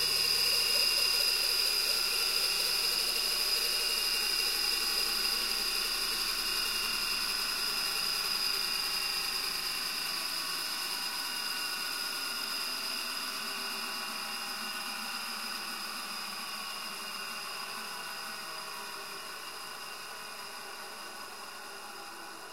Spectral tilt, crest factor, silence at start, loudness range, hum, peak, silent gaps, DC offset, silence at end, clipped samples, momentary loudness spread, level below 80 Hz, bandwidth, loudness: 1 dB/octave; 18 dB; 0 s; 12 LU; none; -16 dBFS; none; 0.2%; 0 s; under 0.1%; 15 LU; -60 dBFS; 16 kHz; -30 LUFS